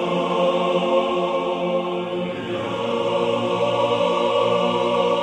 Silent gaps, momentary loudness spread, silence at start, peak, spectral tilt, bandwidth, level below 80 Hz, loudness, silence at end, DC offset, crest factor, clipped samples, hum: none; 6 LU; 0 s; -6 dBFS; -5.5 dB/octave; 9.6 kHz; -60 dBFS; -21 LUFS; 0 s; under 0.1%; 14 dB; under 0.1%; none